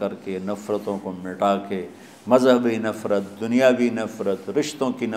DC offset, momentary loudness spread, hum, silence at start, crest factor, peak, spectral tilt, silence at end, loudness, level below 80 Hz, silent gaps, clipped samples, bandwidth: under 0.1%; 13 LU; none; 0 s; 20 dB; -2 dBFS; -5.5 dB/octave; 0 s; -23 LUFS; -70 dBFS; none; under 0.1%; 15 kHz